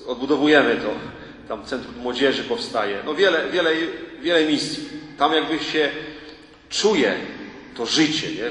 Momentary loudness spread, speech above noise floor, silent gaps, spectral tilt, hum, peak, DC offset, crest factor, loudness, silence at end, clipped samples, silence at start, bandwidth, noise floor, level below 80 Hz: 15 LU; 22 dB; none; -3.5 dB/octave; none; -2 dBFS; under 0.1%; 20 dB; -21 LUFS; 0 s; under 0.1%; 0 s; 11 kHz; -43 dBFS; -56 dBFS